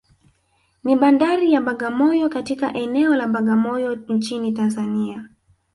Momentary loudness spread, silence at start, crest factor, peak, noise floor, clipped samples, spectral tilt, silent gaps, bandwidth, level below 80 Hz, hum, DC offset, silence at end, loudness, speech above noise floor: 8 LU; 0.85 s; 16 dB; -4 dBFS; -64 dBFS; under 0.1%; -6 dB/octave; none; 11.5 kHz; -62 dBFS; none; under 0.1%; 0.5 s; -20 LUFS; 46 dB